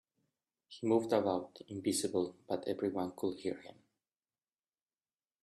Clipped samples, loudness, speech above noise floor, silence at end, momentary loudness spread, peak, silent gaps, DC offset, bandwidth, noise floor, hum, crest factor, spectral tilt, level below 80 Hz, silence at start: under 0.1%; -36 LUFS; over 54 dB; 1.7 s; 10 LU; -16 dBFS; none; under 0.1%; 13 kHz; under -90 dBFS; none; 22 dB; -5 dB/octave; -80 dBFS; 0.7 s